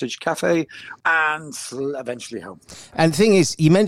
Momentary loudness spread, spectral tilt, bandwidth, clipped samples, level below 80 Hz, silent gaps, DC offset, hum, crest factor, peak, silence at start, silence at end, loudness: 17 LU; -5 dB/octave; 15 kHz; under 0.1%; -56 dBFS; none; under 0.1%; none; 18 dB; -4 dBFS; 0 s; 0 s; -20 LUFS